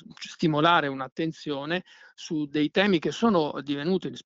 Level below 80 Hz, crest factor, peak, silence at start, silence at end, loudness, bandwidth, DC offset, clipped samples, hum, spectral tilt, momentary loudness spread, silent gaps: -64 dBFS; 20 dB; -8 dBFS; 0.1 s; 0.05 s; -26 LUFS; 7.8 kHz; under 0.1%; under 0.1%; none; -6 dB/octave; 11 LU; 1.12-1.16 s